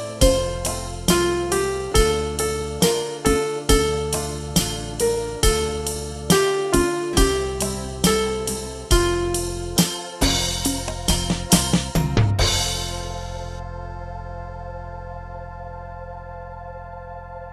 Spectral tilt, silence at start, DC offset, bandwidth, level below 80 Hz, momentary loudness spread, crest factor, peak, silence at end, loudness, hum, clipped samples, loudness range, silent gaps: -4 dB/octave; 0 s; under 0.1%; 15.5 kHz; -30 dBFS; 17 LU; 22 dB; 0 dBFS; 0 s; -21 LUFS; none; under 0.1%; 13 LU; none